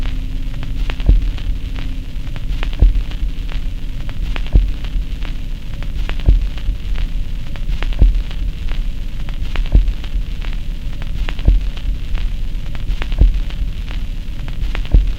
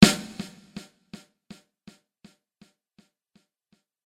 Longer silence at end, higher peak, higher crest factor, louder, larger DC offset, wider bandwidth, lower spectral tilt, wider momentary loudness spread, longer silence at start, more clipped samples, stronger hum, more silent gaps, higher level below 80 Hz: second, 0 s vs 3.65 s; about the same, 0 dBFS vs 0 dBFS; second, 16 dB vs 28 dB; first, -22 LUFS vs -25 LUFS; neither; second, 7 kHz vs 16 kHz; first, -6.5 dB/octave vs -4.5 dB/octave; second, 11 LU vs 23 LU; about the same, 0 s vs 0 s; neither; neither; neither; first, -16 dBFS vs -52 dBFS